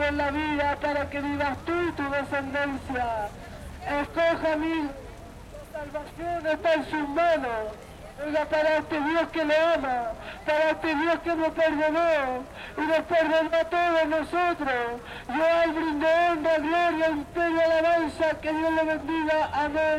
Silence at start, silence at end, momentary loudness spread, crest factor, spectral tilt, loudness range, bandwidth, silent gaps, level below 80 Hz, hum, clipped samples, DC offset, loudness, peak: 0 s; 0 s; 13 LU; 14 dB; -5.5 dB/octave; 5 LU; 13.5 kHz; none; -50 dBFS; none; under 0.1%; under 0.1%; -26 LUFS; -12 dBFS